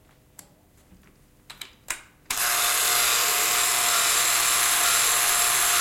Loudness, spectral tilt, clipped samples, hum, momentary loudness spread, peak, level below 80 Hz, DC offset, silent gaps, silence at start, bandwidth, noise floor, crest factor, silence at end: -19 LUFS; 2 dB/octave; under 0.1%; none; 16 LU; -8 dBFS; -56 dBFS; under 0.1%; none; 1.5 s; 16.5 kHz; -56 dBFS; 16 dB; 0 s